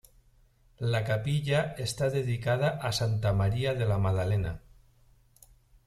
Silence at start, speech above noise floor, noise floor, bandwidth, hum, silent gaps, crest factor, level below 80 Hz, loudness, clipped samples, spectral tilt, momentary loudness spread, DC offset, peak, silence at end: 0.8 s; 34 dB; -62 dBFS; 14 kHz; none; none; 16 dB; -50 dBFS; -29 LUFS; under 0.1%; -6 dB/octave; 4 LU; under 0.1%; -14 dBFS; 1.3 s